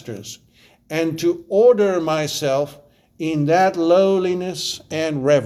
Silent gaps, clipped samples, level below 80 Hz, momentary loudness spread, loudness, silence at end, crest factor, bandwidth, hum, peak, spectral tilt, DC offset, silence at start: none; under 0.1%; -60 dBFS; 13 LU; -19 LUFS; 0 s; 14 dB; 14.5 kHz; none; -4 dBFS; -5 dB/octave; under 0.1%; 0.05 s